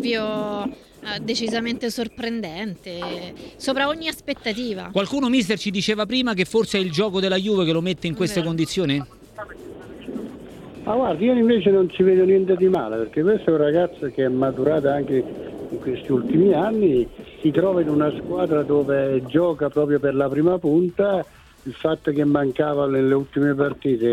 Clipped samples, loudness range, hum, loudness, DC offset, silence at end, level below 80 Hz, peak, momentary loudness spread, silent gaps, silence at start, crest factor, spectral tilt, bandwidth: under 0.1%; 7 LU; none; -21 LUFS; under 0.1%; 0 s; -52 dBFS; -4 dBFS; 14 LU; none; 0 s; 18 dB; -6 dB/octave; 13.5 kHz